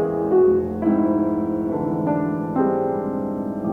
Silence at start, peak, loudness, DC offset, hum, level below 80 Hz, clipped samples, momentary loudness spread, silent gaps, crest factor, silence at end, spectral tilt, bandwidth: 0 s; -8 dBFS; -21 LUFS; under 0.1%; none; -50 dBFS; under 0.1%; 8 LU; none; 14 dB; 0 s; -11 dB/octave; 3.2 kHz